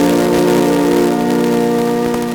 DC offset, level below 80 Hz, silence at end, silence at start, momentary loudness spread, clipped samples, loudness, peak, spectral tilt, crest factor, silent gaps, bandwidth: under 0.1%; -42 dBFS; 0 s; 0 s; 3 LU; under 0.1%; -13 LUFS; 0 dBFS; -5.5 dB/octave; 12 dB; none; over 20 kHz